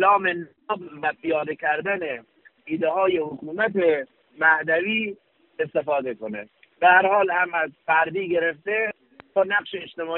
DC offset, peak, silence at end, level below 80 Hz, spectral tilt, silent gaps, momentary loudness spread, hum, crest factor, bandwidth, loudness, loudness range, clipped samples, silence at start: under 0.1%; -4 dBFS; 0 s; -68 dBFS; -2 dB/octave; none; 13 LU; none; 20 dB; 4.2 kHz; -23 LUFS; 4 LU; under 0.1%; 0 s